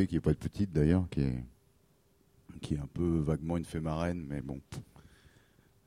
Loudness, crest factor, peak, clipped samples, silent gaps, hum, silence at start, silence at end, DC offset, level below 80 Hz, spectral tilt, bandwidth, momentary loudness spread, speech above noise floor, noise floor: -33 LUFS; 20 dB; -14 dBFS; under 0.1%; none; none; 0 s; 0.85 s; under 0.1%; -46 dBFS; -8 dB/octave; 12 kHz; 19 LU; 36 dB; -68 dBFS